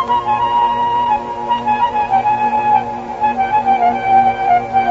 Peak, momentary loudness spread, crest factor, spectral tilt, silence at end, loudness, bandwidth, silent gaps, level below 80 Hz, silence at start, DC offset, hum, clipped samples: -2 dBFS; 6 LU; 12 dB; -5.5 dB/octave; 0 s; -15 LUFS; 7.6 kHz; none; -46 dBFS; 0 s; under 0.1%; none; under 0.1%